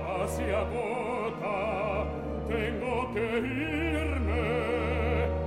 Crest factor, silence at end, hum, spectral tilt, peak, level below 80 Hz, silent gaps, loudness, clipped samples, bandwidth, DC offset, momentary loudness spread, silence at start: 14 dB; 0 s; none; -6.5 dB/octave; -16 dBFS; -38 dBFS; none; -30 LUFS; under 0.1%; 14 kHz; under 0.1%; 3 LU; 0 s